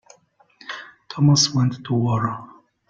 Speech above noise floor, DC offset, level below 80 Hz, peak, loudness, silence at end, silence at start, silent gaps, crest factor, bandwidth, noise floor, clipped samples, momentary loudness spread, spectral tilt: 39 dB; under 0.1%; -58 dBFS; -6 dBFS; -19 LUFS; 0.45 s; 0.65 s; none; 16 dB; 7.8 kHz; -58 dBFS; under 0.1%; 20 LU; -5 dB/octave